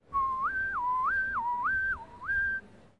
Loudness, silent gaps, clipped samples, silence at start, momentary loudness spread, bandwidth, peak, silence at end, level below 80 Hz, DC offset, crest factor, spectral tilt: -30 LUFS; none; under 0.1%; 0.1 s; 4 LU; 10.5 kHz; -22 dBFS; 0.25 s; -54 dBFS; under 0.1%; 10 dB; -5 dB/octave